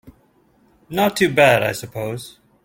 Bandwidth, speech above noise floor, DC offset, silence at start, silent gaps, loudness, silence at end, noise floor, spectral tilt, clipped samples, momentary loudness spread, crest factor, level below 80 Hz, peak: 17 kHz; 39 dB; under 0.1%; 0.05 s; none; -18 LUFS; 0.35 s; -57 dBFS; -4.5 dB/octave; under 0.1%; 16 LU; 18 dB; -54 dBFS; -2 dBFS